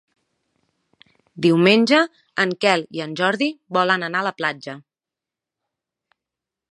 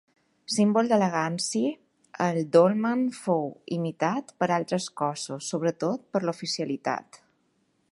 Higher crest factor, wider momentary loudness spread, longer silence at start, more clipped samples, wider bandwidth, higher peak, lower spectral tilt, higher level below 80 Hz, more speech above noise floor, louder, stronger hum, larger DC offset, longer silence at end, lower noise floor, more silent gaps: about the same, 22 dB vs 20 dB; about the same, 12 LU vs 10 LU; first, 1.35 s vs 0.5 s; neither; about the same, 11.5 kHz vs 11.5 kHz; first, 0 dBFS vs -6 dBFS; about the same, -5 dB/octave vs -5 dB/octave; about the same, -72 dBFS vs -76 dBFS; first, 69 dB vs 45 dB; first, -19 LUFS vs -27 LUFS; neither; neither; first, 1.95 s vs 0.75 s; first, -88 dBFS vs -70 dBFS; neither